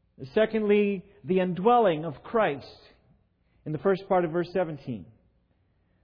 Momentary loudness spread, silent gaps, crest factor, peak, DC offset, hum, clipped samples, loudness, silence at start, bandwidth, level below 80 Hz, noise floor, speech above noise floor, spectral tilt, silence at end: 15 LU; none; 18 dB; -10 dBFS; under 0.1%; none; under 0.1%; -26 LUFS; 0.2 s; 5.4 kHz; -62 dBFS; -68 dBFS; 42 dB; -9.5 dB/octave; 1 s